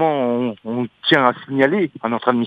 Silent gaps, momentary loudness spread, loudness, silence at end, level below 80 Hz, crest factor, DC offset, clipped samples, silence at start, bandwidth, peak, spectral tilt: none; 9 LU; -19 LUFS; 0 s; -66 dBFS; 18 dB; under 0.1%; under 0.1%; 0 s; 8 kHz; 0 dBFS; -7 dB/octave